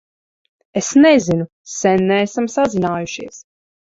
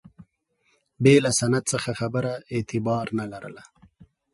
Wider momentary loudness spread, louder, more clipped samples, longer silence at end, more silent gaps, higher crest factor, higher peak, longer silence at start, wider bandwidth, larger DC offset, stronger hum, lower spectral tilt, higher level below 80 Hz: about the same, 16 LU vs 14 LU; first, -16 LUFS vs -23 LUFS; neither; first, 0.6 s vs 0.3 s; first, 1.52-1.64 s vs none; second, 16 dB vs 22 dB; about the same, -2 dBFS vs -4 dBFS; first, 0.75 s vs 0.2 s; second, 7.8 kHz vs 11.5 kHz; neither; neither; about the same, -5 dB/octave vs -5 dB/octave; about the same, -54 dBFS vs -58 dBFS